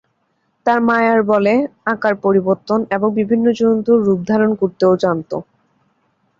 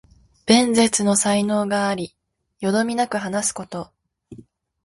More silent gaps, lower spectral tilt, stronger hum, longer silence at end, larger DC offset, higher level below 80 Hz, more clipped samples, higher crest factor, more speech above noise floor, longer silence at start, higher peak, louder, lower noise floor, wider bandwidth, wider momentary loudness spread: neither; first, -7.5 dB/octave vs -3.5 dB/octave; neither; first, 0.95 s vs 0.5 s; neither; about the same, -58 dBFS vs -58 dBFS; neither; second, 14 dB vs 22 dB; first, 50 dB vs 27 dB; first, 0.65 s vs 0.45 s; about the same, -2 dBFS vs 0 dBFS; first, -16 LUFS vs -20 LUFS; first, -65 dBFS vs -47 dBFS; second, 7.4 kHz vs 11.5 kHz; second, 5 LU vs 17 LU